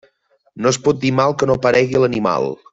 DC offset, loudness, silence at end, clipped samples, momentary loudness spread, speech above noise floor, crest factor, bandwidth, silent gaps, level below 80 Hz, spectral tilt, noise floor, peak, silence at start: under 0.1%; -16 LUFS; 0.2 s; under 0.1%; 4 LU; 44 dB; 14 dB; 8 kHz; none; -50 dBFS; -5.5 dB/octave; -60 dBFS; -2 dBFS; 0.55 s